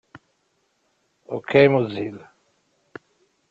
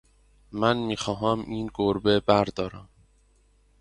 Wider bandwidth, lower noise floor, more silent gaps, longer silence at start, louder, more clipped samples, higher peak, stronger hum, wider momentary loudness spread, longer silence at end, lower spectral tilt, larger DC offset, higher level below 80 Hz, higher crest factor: second, 7.2 kHz vs 11.5 kHz; first, -69 dBFS vs -62 dBFS; neither; second, 0.15 s vs 0.5 s; first, -20 LUFS vs -25 LUFS; neither; about the same, -2 dBFS vs -4 dBFS; neither; first, 29 LU vs 12 LU; first, 1.3 s vs 0.95 s; first, -8 dB/octave vs -6 dB/octave; neither; second, -66 dBFS vs -52 dBFS; about the same, 22 dB vs 22 dB